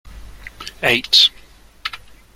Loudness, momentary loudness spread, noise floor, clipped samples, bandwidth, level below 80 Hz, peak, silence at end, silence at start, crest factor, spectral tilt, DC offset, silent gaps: -13 LUFS; 21 LU; -45 dBFS; under 0.1%; 16.5 kHz; -44 dBFS; 0 dBFS; 0.4 s; 0.05 s; 20 dB; -1.5 dB/octave; under 0.1%; none